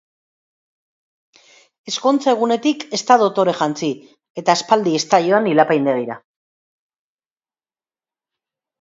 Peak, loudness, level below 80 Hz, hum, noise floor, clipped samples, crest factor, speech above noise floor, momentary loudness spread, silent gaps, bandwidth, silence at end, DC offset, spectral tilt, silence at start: 0 dBFS; -17 LUFS; -70 dBFS; none; under -90 dBFS; under 0.1%; 20 dB; over 73 dB; 11 LU; 4.30-4.35 s; 7.8 kHz; 2.65 s; under 0.1%; -4.5 dB/octave; 1.85 s